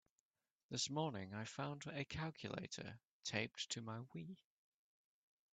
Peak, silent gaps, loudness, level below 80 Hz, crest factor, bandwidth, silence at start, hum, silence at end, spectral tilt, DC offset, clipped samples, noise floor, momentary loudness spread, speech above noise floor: -24 dBFS; 3.05-3.21 s; -47 LUFS; -76 dBFS; 24 dB; 9 kHz; 0.7 s; none; 1.2 s; -4 dB/octave; under 0.1%; under 0.1%; under -90 dBFS; 11 LU; over 43 dB